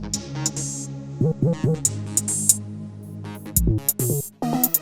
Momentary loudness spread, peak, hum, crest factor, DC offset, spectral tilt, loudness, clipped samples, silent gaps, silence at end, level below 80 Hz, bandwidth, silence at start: 16 LU; 0 dBFS; none; 24 dB; under 0.1%; -4.5 dB/octave; -22 LUFS; under 0.1%; none; 0 s; -36 dBFS; over 20 kHz; 0 s